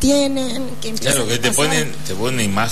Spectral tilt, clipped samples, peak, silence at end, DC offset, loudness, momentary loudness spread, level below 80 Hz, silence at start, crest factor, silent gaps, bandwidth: -3.5 dB/octave; under 0.1%; -4 dBFS; 0 s; 7%; -18 LUFS; 9 LU; -40 dBFS; 0 s; 14 dB; none; 13.5 kHz